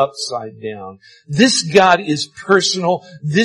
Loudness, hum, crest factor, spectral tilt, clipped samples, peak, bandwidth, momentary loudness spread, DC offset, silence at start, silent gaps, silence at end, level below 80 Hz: -15 LUFS; none; 16 dB; -4 dB/octave; under 0.1%; 0 dBFS; 12 kHz; 17 LU; under 0.1%; 0 s; none; 0 s; -56 dBFS